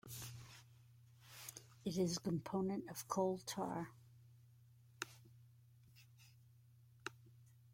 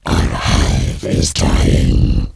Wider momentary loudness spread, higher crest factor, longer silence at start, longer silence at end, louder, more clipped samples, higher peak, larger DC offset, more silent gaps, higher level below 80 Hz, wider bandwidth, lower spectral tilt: first, 26 LU vs 4 LU; first, 24 dB vs 14 dB; about the same, 0.05 s vs 0.05 s; about the same, 0 s vs 0.05 s; second, -44 LUFS vs -15 LUFS; neither; second, -24 dBFS vs 0 dBFS; neither; neither; second, -78 dBFS vs -16 dBFS; first, 16.5 kHz vs 11 kHz; about the same, -5 dB/octave vs -5 dB/octave